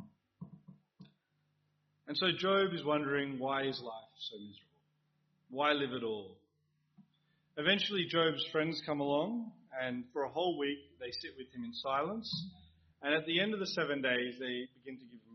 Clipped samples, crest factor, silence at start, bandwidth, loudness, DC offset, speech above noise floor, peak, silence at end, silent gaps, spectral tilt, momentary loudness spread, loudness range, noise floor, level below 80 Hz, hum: under 0.1%; 22 dB; 0 s; 6.2 kHz; -35 LUFS; under 0.1%; 43 dB; -16 dBFS; 0 s; none; -2 dB/octave; 17 LU; 4 LU; -79 dBFS; -78 dBFS; none